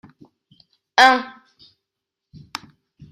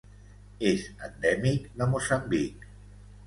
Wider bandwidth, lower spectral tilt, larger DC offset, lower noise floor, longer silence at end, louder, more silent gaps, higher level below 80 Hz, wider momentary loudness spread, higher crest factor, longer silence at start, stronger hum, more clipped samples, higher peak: first, 15.5 kHz vs 11.5 kHz; second, -2 dB/octave vs -5.5 dB/octave; neither; first, -83 dBFS vs -50 dBFS; first, 1.8 s vs 0 s; first, -16 LUFS vs -28 LUFS; neither; second, -64 dBFS vs -50 dBFS; first, 22 LU vs 9 LU; about the same, 22 dB vs 20 dB; first, 0.95 s vs 0.6 s; second, none vs 50 Hz at -45 dBFS; neither; first, 0 dBFS vs -10 dBFS